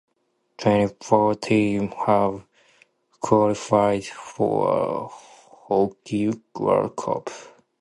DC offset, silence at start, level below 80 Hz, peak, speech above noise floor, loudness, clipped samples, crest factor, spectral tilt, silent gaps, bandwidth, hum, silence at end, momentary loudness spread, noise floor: under 0.1%; 0.6 s; -58 dBFS; -2 dBFS; 49 dB; -22 LUFS; under 0.1%; 20 dB; -6.5 dB/octave; none; 11.5 kHz; none; 0.3 s; 11 LU; -71 dBFS